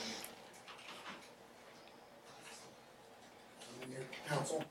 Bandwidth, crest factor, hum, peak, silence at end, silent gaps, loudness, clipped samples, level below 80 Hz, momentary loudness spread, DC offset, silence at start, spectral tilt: 16.5 kHz; 22 dB; none; -26 dBFS; 0 s; none; -48 LUFS; under 0.1%; -82 dBFS; 18 LU; under 0.1%; 0 s; -3.5 dB/octave